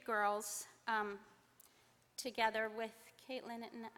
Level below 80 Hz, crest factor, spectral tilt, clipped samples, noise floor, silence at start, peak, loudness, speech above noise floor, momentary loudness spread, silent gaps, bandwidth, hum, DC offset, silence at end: -82 dBFS; 22 dB; -2 dB/octave; under 0.1%; -71 dBFS; 0.05 s; -22 dBFS; -41 LUFS; 30 dB; 13 LU; none; 19 kHz; none; under 0.1%; 0.1 s